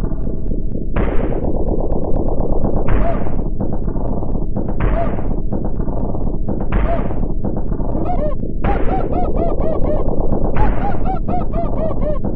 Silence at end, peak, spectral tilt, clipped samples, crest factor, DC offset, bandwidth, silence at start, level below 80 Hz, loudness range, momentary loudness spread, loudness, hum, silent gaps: 0 s; 0 dBFS; -11.5 dB/octave; under 0.1%; 14 dB; under 0.1%; 3.2 kHz; 0 s; -18 dBFS; 2 LU; 4 LU; -21 LUFS; none; none